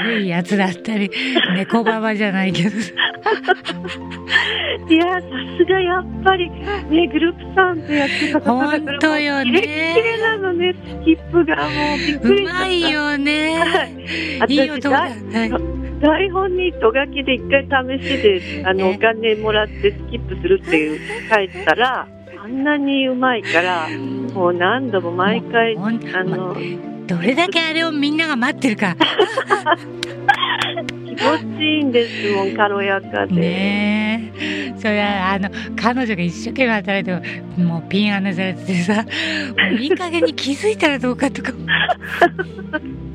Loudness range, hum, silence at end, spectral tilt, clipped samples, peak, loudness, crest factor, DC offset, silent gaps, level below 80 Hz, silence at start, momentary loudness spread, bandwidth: 2 LU; none; 0 s; -5.5 dB/octave; under 0.1%; 0 dBFS; -18 LUFS; 18 dB; under 0.1%; none; -40 dBFS; 0 s; 7 LU; 11.5 kHz